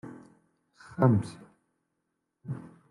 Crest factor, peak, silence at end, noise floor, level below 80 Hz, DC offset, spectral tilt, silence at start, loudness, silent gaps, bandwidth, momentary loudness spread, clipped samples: 22 dB; -10 dBFS; 0.3 s; -81 dBFS; -66 dBFS; under 0.1%; -9 dB/octave; 0.05 s; -28 LUFS; none; 11 kHz; 22 LU; under 0.1%